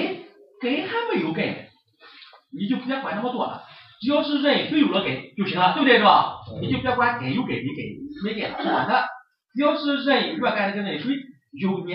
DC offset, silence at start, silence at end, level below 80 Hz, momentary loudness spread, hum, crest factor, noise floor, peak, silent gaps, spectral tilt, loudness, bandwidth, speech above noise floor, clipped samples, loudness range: under 0.1%; 0 s; 0 s; -60 dBFS; 12 LU; none; 20 dB; -51 dBFS; -4 dBFS; none; -9 dB/octave; -23 LUFS; 5.6 kHz; 28 dB; under 0.1%; 7 LU